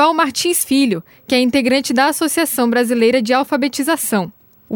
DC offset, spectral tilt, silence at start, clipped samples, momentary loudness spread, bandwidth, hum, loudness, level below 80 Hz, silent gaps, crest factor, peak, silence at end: under 0.1%; -3 dB/octave; 0 s; under 0.1%; 5 LU; over 20 kHz; none; -15 LUFS; -58 dBFS; none; 14 dB; -2 dBFS; 0 s